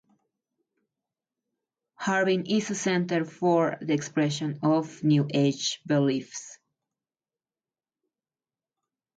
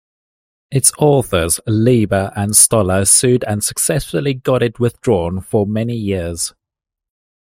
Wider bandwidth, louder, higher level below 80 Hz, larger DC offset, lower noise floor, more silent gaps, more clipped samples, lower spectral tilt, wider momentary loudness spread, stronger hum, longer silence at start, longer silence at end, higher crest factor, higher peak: second, 9.2 kHz vs 16.5 kHz; second, -26 LUFS vs -14 LUFS; second, -74 dBFS vs -42 dBFS; neither; first, under -90 dBFS vs -84 dBFS; neither; neither; about the same, -5.5 dB/octave vs -4.5 dB/octave; about the same, 7 LU vs 9 LU; neither; first, 2 s vs 0.7 s; first, 2.6 s vs 0.9 s; about the same, 16 dB vs 16 dB; second, -12 dBFS vs 0 dBFS